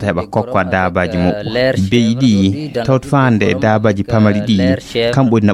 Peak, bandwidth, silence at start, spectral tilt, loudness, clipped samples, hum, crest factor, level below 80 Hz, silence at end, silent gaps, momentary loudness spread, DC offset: -2 dBFS; 12 kHz; 0 s; -7 dB/octave; -14 LUFS; under 0.1%; none; 12 dB; -42 dBFS; 0 s; none; 4 LU; under 0.1%